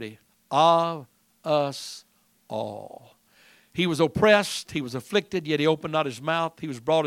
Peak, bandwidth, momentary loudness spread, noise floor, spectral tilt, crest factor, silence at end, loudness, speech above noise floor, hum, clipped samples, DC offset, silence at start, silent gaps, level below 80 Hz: -4 dBFS; 16.5 kHz; 18 LU; -58 dBFS; -5 dB/octave; 22 dB; 0 s; -25 LUFS; 34 dB; none; under 0.1%; under 0.1%; 0 s; none; -60 dBFS